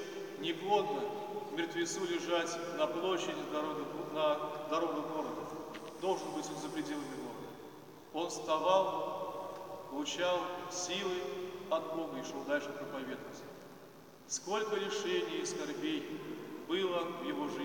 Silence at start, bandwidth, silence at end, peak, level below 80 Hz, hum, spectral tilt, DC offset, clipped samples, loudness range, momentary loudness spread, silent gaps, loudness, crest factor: 0 s; 17 kHz; 0 s; -16 dBFS; -80 dBFS; none; -3.5 dB/octave; under 0.1%; under 0.1%; 4 LU; 12 LU; none; -37 LUFS; 22 dB